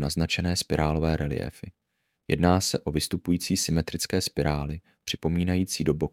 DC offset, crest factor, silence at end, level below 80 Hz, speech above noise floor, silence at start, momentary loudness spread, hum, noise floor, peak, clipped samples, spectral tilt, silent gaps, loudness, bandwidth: under 0.1%; 20 dB; 0.05 s; -40 dBFS; 22 dB; 0 s; 9 LU; none; -48 dBFS; -6 dBFS; under 0.1%; -5 dB/octave; none; -26 LUFS; 16.5 kHz